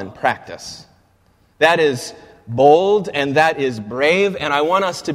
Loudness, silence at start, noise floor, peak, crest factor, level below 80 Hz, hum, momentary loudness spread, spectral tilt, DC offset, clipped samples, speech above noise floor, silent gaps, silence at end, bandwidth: -16 LUFS; 0 s; -56 dBFS; 0 dBFS; 18 dB; -56 dBFS; none; 15 LU; -4.5 dB/octave; under 0.1%; under 0.1%; 40 dB; none; 0 s; 15 kHz